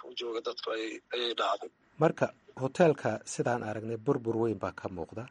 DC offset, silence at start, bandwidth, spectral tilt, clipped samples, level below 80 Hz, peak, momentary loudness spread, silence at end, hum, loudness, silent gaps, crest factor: under 0.1%; 0 s; 10.5 kHz; -5.5 dB/octave; under 0.1%; -68 dBFS; -10 dBFS; 11 LU; 0 s; none; -32 LUFS; none; 22 dB